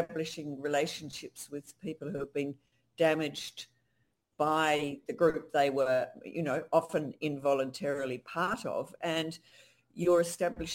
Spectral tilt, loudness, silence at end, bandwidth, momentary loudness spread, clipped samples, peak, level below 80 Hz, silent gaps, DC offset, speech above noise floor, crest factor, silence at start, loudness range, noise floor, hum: -4.5 dB/octave; -32 LUFS; 0 s; 16.5 kHz; 14 LU; under 0.1%; -12 dBFS; -66 dBFS; none; under 0.1%; 45 dB; 22 dB; 0 s; 5 LU; -77 dBFS; none